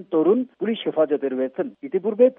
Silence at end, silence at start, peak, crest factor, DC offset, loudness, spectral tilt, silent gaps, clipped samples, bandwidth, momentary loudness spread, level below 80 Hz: 0.05 s; 0 s; -4 dBFS; 16 dB; under 0.1%; -23 LUFS; -5 dB/octave; none; under 0.1%; 3.8 kHz; 7 LU; -82 dBFS